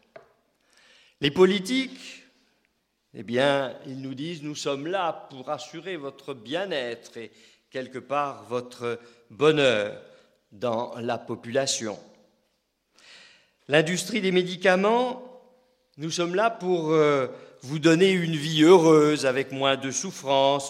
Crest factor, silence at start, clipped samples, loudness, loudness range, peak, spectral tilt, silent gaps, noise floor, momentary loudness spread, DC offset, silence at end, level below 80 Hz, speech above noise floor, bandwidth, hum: 22 dB; 1.2 s; under 0.1%; -24 LUFS; 11 LU; -4 dBFS; -4.5 dB/octave; none; -73 dBFS; 18 LU; under 0.1%; 0 s; -70 dBFS; 49 dB; 14 kHz; none